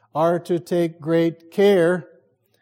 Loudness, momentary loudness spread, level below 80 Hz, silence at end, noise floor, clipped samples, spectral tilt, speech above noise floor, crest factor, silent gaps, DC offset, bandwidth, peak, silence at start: -20 LUFS; 7 LU; -72 dBFS; 0.6 s; -58 dBFS; under 0.1%; -7 dB/octave; 39 dB; 14 dB; none; under 0.1%; 16 kHz; -6 dBFS; 0.15 s